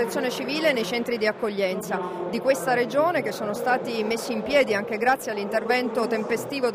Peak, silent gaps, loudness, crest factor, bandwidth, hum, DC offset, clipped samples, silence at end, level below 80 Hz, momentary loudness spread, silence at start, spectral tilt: -8 dBFS; none; -24 LUFS; 16 dB; 16 kHz; none; under 0.1%; under 0.1%; 0 s; -64 dBFS; 5 LU; 0 s; -4 dB/octave